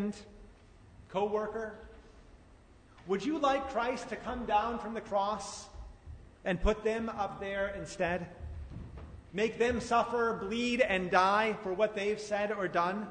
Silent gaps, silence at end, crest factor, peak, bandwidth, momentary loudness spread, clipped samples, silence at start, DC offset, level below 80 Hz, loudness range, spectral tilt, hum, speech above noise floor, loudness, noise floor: none; 0 s; 22 dB; -12 dBFS; 9.6 kHz; 18 LU; under 0.1%; 0 s; under 0.1%; -50 dBFS; 6 LU; -5 dB/octave; none; 26 dB; -32 LUFS; -58 dBFS